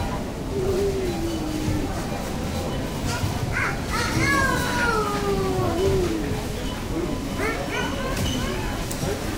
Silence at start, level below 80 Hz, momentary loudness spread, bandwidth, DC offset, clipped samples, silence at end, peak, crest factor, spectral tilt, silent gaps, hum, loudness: 0 s; -34 dBFS; 6 LU; 16 kHz; under 0.1%; under 0.1%; 0 s; -10 dBFS; 16 dB; -5 dB/octave; none; none; -25 LUFS